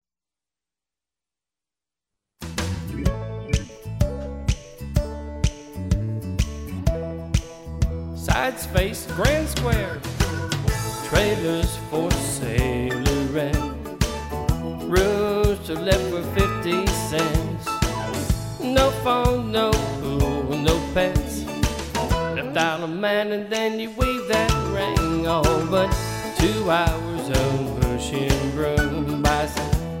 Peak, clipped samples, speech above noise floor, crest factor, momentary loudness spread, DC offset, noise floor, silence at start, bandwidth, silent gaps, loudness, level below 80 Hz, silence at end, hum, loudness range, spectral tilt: -4 dBFS; under 0.1%; over 68 dB; 20 dB; 7 LU; under 0.1%; under -90 dBFS; 2.4 s; 16.5 kHz; none; -23 LUFS; -30 dBFS; 0 s; none; 6 LU; -5 dB/octave